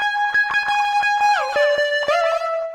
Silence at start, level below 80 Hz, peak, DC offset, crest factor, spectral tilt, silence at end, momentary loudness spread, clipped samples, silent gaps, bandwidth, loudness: 0 s; -58 dBFS; -8 dBFS; under 0.1%; 12 dB; 0 dB/octave; 0 s; 2 LU; under 0.1%; none; 14.5 kHz; -18 LUFS